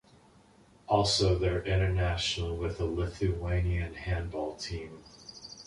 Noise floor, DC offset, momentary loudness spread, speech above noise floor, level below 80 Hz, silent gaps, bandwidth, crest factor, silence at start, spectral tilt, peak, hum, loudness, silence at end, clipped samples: -60 dBFS; under 0.1%; 17 LU; 30 dB; -40 dBFS; none; 11 kHz; 20 dB; 0.9 s; -5 dB/octave; -12 dBFS; none; -31 LUFS; 0.05 s; under 0.1%